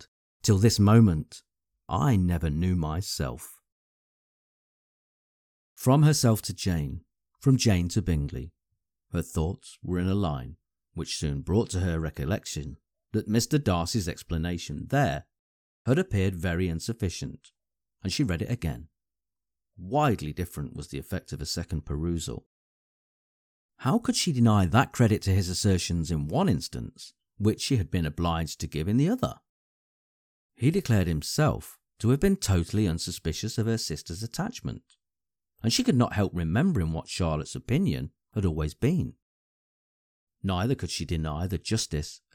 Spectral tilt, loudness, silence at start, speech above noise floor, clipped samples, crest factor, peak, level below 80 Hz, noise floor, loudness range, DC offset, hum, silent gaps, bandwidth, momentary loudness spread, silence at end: -5.5 dB/octave; -27 LUFS; 0 s; over 64 dB; under 0.1%; 20 dB; -8 dBFS; -44 dBFS; under -90 dBFS; 7 LU; under 0.1%; none; 0.08-0.40 s, 3.72-5.76 s, 15.39-15.85 s, 22.46-23.69 s, 29.49-30.50 s, 39.22-40.27 s; 18.5 kHz; 13 LU; 0.2 s